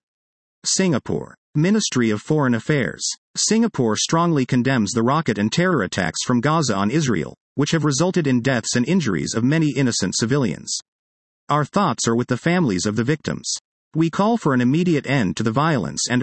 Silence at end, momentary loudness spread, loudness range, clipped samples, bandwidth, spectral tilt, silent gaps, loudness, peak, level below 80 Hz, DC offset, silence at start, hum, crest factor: 0 s; 6 LU; 2 LU; under 0.1%; 8.8 kHz; -4.5 dB/octave; 1.38-1.53 s, 3.18-3.34 s, 7.37-7.56 s, 10.88-11.47 s, 13.61-13.91 s; -20 LUFS; -4 dBFS; -56 dBFS; under 0.1%; 0.65 s; none; 16 dB